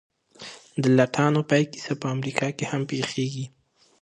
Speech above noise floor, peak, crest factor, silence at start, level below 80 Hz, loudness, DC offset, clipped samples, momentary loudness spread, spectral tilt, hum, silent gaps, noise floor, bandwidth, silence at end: 21 dB; -4 dBFS; 22 dB; 0.4 s; -68 dBFS; -24 LUFS; under 0.1%; under 0.1%; 18 LU; -6 dB/octave; none; none; -45 dBFS; 11 kHz; 0.55 s